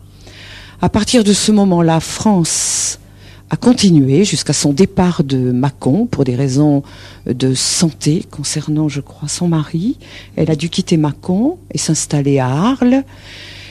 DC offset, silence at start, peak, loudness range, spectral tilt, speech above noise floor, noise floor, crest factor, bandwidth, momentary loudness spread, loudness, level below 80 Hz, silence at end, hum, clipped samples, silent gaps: under 0.1%; 0.25 s; 0 dBFS; 4 LU; -5 dB/octave; 25 dB; -39 dBFS; 14 dB; 13.5 kHz; 13 LU; -14 LUFS; -42 dBFS; 0 s; none; under 0.1%; none